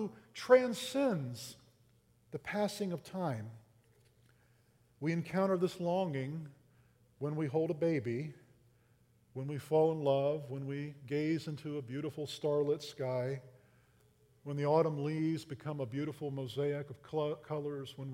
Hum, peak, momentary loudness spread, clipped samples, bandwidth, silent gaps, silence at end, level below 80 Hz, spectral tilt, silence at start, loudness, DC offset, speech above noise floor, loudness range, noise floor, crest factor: none; -12 dBFS; 13 LU; under 0.1%; 16 kHz; none; 0 s; -76 dBFS; -6.5 dB/octave; 0 s; -36 LUFS; under 0.1%; 34 dB; 4 LU; -69 dBFS; 24 dB